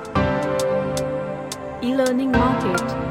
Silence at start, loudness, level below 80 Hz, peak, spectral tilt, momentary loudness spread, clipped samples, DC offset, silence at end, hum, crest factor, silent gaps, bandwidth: 0 s; -22 LUFS; -38 dBFS; -6 dBFS; -5.5 dB/octave; 9 LU; under 0.1%; under 0.1%; 0 s; none; 16 dB; none; 16.5 kHz